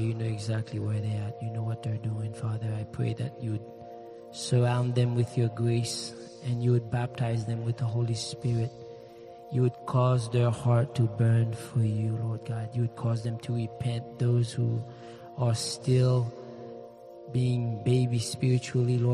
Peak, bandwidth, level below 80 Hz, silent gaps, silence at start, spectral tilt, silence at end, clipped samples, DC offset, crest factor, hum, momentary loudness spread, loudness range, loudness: -14 dBFS; 11.5 kHz; -62 dBFS; none; 0 s; -6.5 dB/octave; 0 s; under 0.1%; under 0.1%; 14 dB; none; 17 LU; 5 LU; -29 LUFS